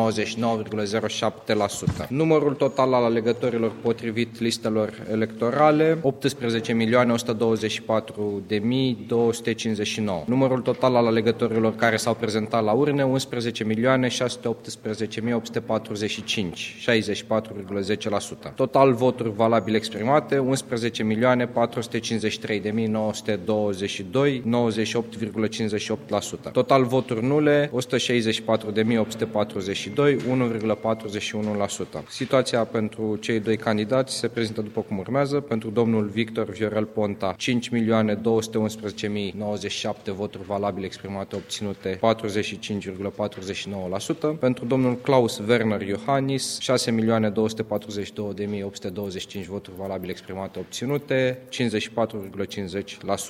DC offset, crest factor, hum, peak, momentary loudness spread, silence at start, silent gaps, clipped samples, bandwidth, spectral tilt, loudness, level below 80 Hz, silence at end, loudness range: under 0.1%; 20 dB; none; -4 dBFS; 10 LU; 0 s; none; under 0.1%; 15.5 kHz; -5.5 dB/octave; -24 LUFS; -60 dBFS; 0 s; 5 LU